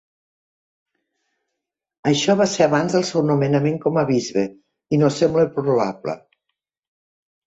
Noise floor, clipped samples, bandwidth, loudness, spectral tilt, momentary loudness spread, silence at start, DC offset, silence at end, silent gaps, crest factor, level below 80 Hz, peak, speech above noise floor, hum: -82 dBFS; under 0.1%; 8.2 kHz; -19 LUFS; -5.5 dB/octave; 9 LU; 2.05 s; under 0.1%; 1.3 s; none; 18 dB; -60 dBFS; -4 dBFS; 64 dB; none